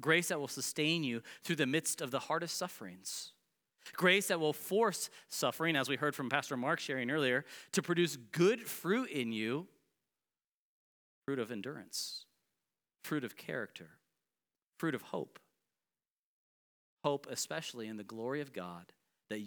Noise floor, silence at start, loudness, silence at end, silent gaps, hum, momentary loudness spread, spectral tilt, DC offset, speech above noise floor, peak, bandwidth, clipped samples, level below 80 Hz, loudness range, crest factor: under -90 dBFS; 0 s; -36 LUFS; 0 s; 10.47-11.22 s, 14.66-14.70 s, 16.12-16.97 s; none; 14 LU; -3.5 dB/octave; under 0.1%; over 54 dB; -14 dBFS; over 20 kHz; under 0.1%; under -90 dBFS; 11 LU; 24 dB